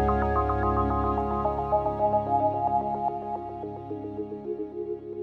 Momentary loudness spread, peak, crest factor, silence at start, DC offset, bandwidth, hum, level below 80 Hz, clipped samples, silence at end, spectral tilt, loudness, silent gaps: 11 LU; -12 dBFS; 14 dB; 0 s; under 0.1%; 5.8 kHz; none; -38 dBFS; under 0.1%; 0 s; -10 dB/octave; -28 LUFS; none